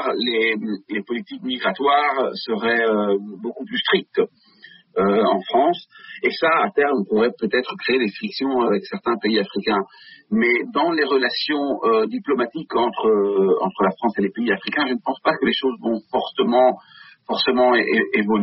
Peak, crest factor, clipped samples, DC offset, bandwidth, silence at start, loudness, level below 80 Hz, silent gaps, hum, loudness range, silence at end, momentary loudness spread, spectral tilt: -6 dBFS; 14 dB; under 0.1%; under 0.1%; 5.8 kHz; 0 s; -20 LUFS; -62 dBFS; none; none; 2 LU; 0 s; 8 LU; -2.5 dB/octave